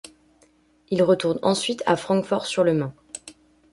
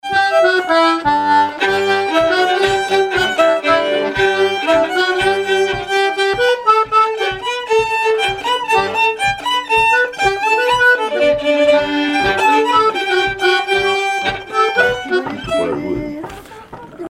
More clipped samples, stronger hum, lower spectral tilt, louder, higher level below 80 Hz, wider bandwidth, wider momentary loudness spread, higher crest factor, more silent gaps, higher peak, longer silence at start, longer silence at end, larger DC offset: neither; neither; first, -5 dB/octave vs -3.5 dB/octave; second, -22 LUFS vs -14 LUFS; second, -62 dBFS vs -44 dBFS; second, 11.5 kHz vs 15.5 kHz; first, 15 LU vs 7 LU; first, 20 dB vs 14 dB; neither; second, -6 dBFS vs 0 dBFS; first, 0.9 s vs 0.05 s; first, 0.4 s vs 0 s; neither